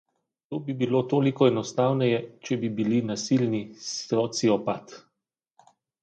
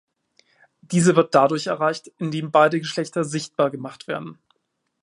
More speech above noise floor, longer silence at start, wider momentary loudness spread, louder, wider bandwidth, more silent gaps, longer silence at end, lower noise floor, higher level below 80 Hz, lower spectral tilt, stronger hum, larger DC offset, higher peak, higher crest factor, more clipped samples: first, 58 dB vs 54 dB; second, 0.5 s vs 0.9 s; second, 10 LU vs 14 LU; second, -26 LUFS vs -21 LUFS; second, 9 kHz vs 11.5 kHz; neither; first, 1.05 s vs 0.7 s; first, -83 dBFS vs -75 dBFS; about the same, -70 dBFS vs -68 dBFS; about the same, -6 dB/octave vs -5.5 dB/octave; neither; neither; second, -6 dBFS vs 0 dBFS; about the same, 20 dB vs 22 dB; neither